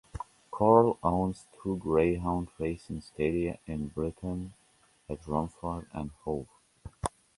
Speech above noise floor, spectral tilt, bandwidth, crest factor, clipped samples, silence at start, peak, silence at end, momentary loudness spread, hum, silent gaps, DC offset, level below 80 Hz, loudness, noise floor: 36 dB; -8 dB/octave; 11.5 kHz; 24 dB; under 0.1%; 0.15 s; -6 dBFS; 0.3 s; 18 LU; none; none; under 0.1%; -48 dBFS; -31 LUFS; -66 dBFS